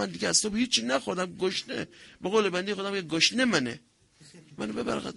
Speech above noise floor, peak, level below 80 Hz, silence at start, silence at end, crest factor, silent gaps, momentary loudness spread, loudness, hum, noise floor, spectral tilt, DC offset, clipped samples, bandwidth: 27 dB; -8 dBFS; -62 dBFS; 0 s; 0 s; 22 dB; none; 12 LU; -27 LUFS; none; -56 dBFS; -2.5 dB/octave; under 0.1%; under 0.1%; 11.5 kHz